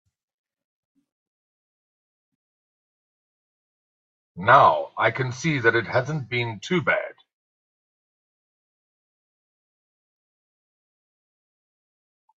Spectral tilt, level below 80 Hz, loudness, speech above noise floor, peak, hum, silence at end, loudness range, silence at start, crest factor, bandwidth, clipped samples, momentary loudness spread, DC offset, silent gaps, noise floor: -5.5 dB/octave; -68 dBFS; -21 LUFS; over 69 dB; -2 dBFS; none; 5.25 s; 10 LU; 4.35 s; 26 dB; 8 kHz; under 0.1%; 12 LU; under 0.1%; none; under -90 dBFS